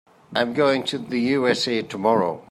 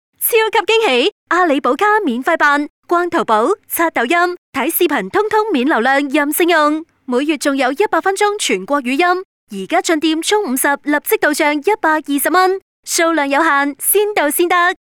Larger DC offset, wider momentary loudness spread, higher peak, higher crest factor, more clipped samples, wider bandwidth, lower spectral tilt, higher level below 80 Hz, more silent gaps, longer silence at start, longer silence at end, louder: neither; about the same, 5 LU vs 5 LU; second, -6 dBFS vs -2 dBFS; first, 18 dB vs 12 dB; neither; second, 15 kHz vs 20 kHz; first, -5 dB/octave vs -2 dB/octave; about the same, -66 dBFS vs -64 dBFS; second, none vs 1.12-1.27 s, 2.70-2.83 s, 4.38-4.53 s, 9.25-9.47 s, 12.62-12.83 s; about the same, 0.3 s vs 0.2 s; about the same, 0.1 s vs 0.2 s; second, -22 LUFS vs -14 LUFS